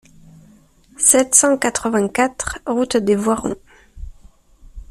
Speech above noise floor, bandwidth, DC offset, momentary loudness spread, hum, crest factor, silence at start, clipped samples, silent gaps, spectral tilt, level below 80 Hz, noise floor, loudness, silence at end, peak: 33 dB; 15.5 kHz; under 0.1%; 11 LU; none; 20 dB; 1 s; under 0.1%; none; -3 dB/octave; -42 dBFS; -50 dBFS; -16 LUFS; 0.05 s; 0 dBFS